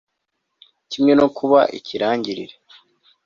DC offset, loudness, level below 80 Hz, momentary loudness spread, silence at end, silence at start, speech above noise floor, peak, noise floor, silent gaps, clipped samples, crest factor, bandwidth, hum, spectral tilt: under 0.1%; -18 LUFS; -60 dBFS; 17 LU; 0.8 s; 0.9 s; 58 dB; -2 dBFS; -76 dBFS; none; under 0.1%; 20 dB; 7.2 kHz; none; -6 dB/octave